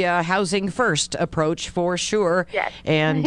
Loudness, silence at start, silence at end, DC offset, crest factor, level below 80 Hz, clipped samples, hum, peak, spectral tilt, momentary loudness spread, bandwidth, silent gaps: -22 LUFS; 0 s; 0 s; under 0.1%; 16 dB; -50 dBFS; under 0.1%; none; -6 dBFS; -4.5 dB/octave; 4 LU; 11 kHz; none